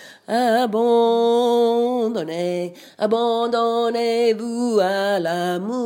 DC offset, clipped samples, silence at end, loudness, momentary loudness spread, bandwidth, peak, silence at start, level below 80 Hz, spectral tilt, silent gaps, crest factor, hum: under 0.1%; under 0.1%; 0 s; -20 LUFS; 7 LU; 16.5 kHz; -6 dBFS; 0 s; -78 dBFS; -5 dB/octave; none; 14 dB; none